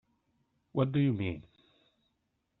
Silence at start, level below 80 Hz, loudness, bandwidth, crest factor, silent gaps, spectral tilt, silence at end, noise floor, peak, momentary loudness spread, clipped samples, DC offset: 0.75 s; -66 dBFS; -32 LUFS; 4.1 kHz; 20 dB; none; -7.5 dB/octave; 1.2 s; -80 dBFS; -14 dBFS; 10 LU; under 0.1%; under 0.1%